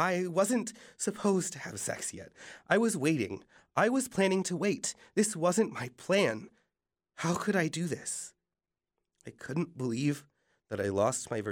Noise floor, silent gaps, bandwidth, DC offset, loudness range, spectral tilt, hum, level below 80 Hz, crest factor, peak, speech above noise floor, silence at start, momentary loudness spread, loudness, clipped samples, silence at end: under -90 dBFS; none; 19 kHz; under 0.1%; 6 LU; -4.5 dB/octave; none; -72 dBFS; 22 dB; -10 dBFS; over 59 dB; 0 s; 13 LU; -31 LUFS; under 0.1%; 0 s